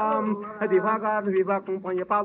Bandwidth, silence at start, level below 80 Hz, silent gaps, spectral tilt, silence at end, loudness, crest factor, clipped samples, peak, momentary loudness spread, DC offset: 3.9 kHz; 0 s; -70 dBFS; none; -6.5 dB/octave; 0 s; -25 LUFS; 14 dB; under 0.1%; -10 dBFS; 6 LU; under 0.1%